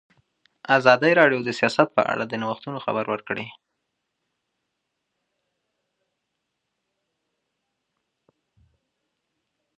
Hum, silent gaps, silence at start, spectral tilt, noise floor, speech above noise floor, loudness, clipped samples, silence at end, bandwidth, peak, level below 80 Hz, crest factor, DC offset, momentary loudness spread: none; none; 0.7 s; -5.5 dB/octave; -79 dBFS; 58 dB; -21 LUFS; under 0.1%; 6.25 s; 9.6 kHz; -2 dBFS; -72 dBFS; 26 dB; under 0.1%; 15 LU